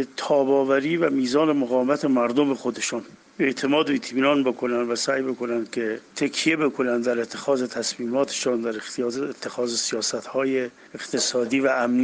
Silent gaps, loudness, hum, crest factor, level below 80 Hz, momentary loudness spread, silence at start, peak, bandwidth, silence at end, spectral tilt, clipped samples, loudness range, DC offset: none; -23 LUFS; none; 16 dB; -70 dBFS; 7 LU; 0 s; -6 dBFS; 10 kHz; 0 s; -3.5 dB/octave; under 0.1%; 3 LU; under 0.1%